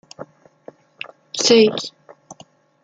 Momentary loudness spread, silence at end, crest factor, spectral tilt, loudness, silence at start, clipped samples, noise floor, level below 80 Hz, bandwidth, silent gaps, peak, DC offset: 26 LU; 0.5 s; 20 dB; -3 dB/octave; -16 LUFS; 0.2 s; under 0.1%; -50 dBFS; -68 dBFS; 9.2 kHz; none; -2 dBFS; under 0.1%